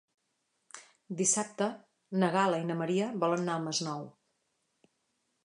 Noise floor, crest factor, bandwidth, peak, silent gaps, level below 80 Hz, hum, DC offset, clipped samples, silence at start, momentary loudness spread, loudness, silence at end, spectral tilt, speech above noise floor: -79 dBFS; 22 dB; 11 kHz; -12 dBFS; none; -84 dBFS; none; under 0.1%; under 0.1%; 0.75 s; 23 LU; -31 LUFS; 1.35 s; -4 dB/octave; 48 dB